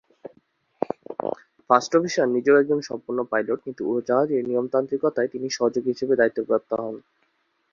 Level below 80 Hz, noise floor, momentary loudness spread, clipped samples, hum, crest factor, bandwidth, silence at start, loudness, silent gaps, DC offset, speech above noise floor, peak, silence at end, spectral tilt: -68 dBFS; -69 dBFS; 12 LU; under 0.1%; none; 22 dB; 7.4 kHz; 0.25 s; -23 LUFS; none; under 0.1%; 47 dB; -2 dBFS; 0.75 s; -5 dB/octave